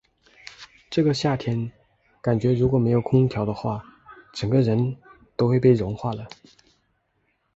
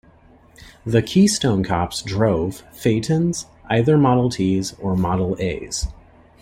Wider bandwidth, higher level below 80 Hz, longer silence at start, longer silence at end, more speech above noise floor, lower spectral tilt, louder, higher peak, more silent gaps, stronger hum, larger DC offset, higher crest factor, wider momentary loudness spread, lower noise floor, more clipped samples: second, 8 kHz vs 16 kHz; second, -50 dBFS vs -40 dBFS; about the same, 0.6 s vs 0.65 s; first, 1.3 s vs 0.5 s; first, 49 dB vs 31 dB; first, -8 dB/octave vs -6 dB/octave; second, -23 LUFS vs -20 LUFS; second, -6 dBFS vs -2 dBFS; neither; neither; neither; about the same, 18 dB vs 18 dB; first, 18 LU vs 11 LU; first, -70 dBFS vs -50 dBFS; neither